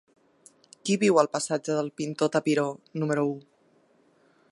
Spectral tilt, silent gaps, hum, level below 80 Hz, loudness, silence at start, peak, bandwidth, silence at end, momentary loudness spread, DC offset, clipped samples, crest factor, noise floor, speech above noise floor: -5 dB/octave; none; none; -78 dBFS; -26 LUFS; 0.85 s; -6 dBFS; 11.5 kHz; 1.1 s; 10 LU; under 0.1%; under 0.1%; 22 dB; -64 dBFS; 38 dB